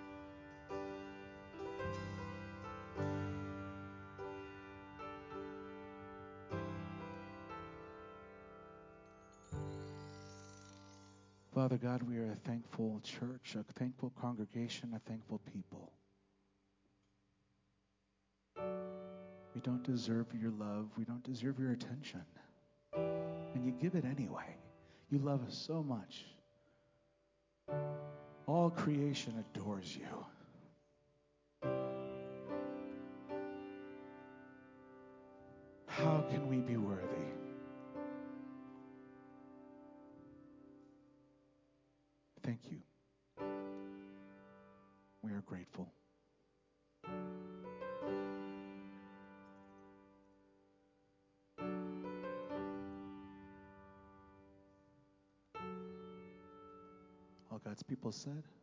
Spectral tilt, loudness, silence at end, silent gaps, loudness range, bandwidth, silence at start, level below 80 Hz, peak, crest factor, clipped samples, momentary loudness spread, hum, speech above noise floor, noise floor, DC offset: -7 dB/octave; -44 LUFS; 0.05 s; none; 13 LU; 7.6 kHz; 0 s; -70 dBFS; -20 dBFS; 24 dB; under 0.1%; 21 LU; none; 41 dB; -82 dBFS; under 0.1%